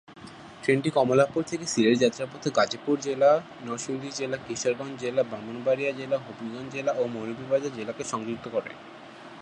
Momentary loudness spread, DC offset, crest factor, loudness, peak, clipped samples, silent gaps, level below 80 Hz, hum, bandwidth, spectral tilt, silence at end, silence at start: 15 LU; under 0.1%; 20 dB; -27 LUFS; -6 dBFS; under 0.1%; none; -68 dBFS; none; 11 kHz; -4.5 dB/octave; 0 s; 0.1 s